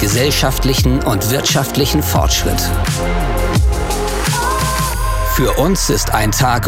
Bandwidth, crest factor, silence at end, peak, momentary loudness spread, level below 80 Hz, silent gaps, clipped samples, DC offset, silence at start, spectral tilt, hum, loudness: 16.5 kHz; 14 dB; 0 s; 0 dBFS; 4 LU; -20 dBFS; none; under 0.1%; under 0.1%; 0 s; -4 dB/octave; none; -15 LUFS